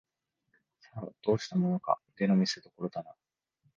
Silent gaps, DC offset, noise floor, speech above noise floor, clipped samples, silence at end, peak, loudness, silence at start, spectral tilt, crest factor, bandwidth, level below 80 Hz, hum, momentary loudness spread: none; under 0.1%; -78 dBFS; 47 dB; under 0.1%; 0.65 s; -12 dBFS; -31 LUFS; 0.95 s; -6.5 dB/octave; 22 dB; 7.4 kHz; -70 dBFS; none; 17 LU